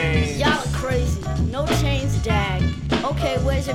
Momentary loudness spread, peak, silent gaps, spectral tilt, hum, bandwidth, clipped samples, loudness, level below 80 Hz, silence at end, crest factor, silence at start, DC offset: 3 LU; -4 dBFS; none; -5.5 dB/octave; none; 16 kHz; under 0.1%; -22 LUFS; -28 dBFS; 0 s; 16 dB; 0 s; under 0.1%